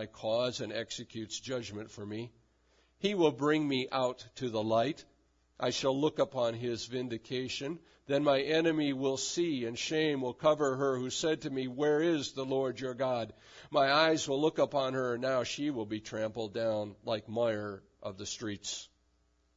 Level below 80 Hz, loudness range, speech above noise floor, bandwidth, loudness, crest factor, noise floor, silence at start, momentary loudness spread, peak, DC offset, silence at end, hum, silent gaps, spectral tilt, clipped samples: -70 dBFS; 5 LU; 40 dB; 7.4 kHz; -33 LUFS; 20 dB; -72 dBFS; 0 s; 12 LU; -14 dBFS; under 0.1%; 0.7 s; none; none; -3.5 dB/octave; under 0.1%